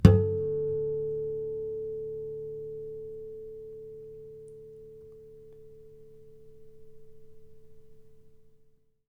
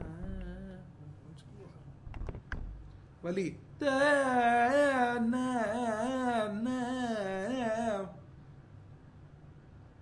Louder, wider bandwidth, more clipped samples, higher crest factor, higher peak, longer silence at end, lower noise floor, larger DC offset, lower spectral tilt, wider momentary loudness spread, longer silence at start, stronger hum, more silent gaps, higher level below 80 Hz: about the same, -32 LUFS vs -31 LUFS; about the same, 11 kHz vs 11.5 kHz; neither; first, 30 dB vs 18 dB; first, 0 dBFS vs -16 dBFS; first, 0.6 s vs 0.15 s; first, -62 dBFS vs -54 dBFS; neither; first, -9.5 dB/octave vs -5.5 dB/octave; second, 22 LU vs 25 LU; about the same, 0 s vs 0 s; neither; neither; first, -44 dBFS vs -52 dBFS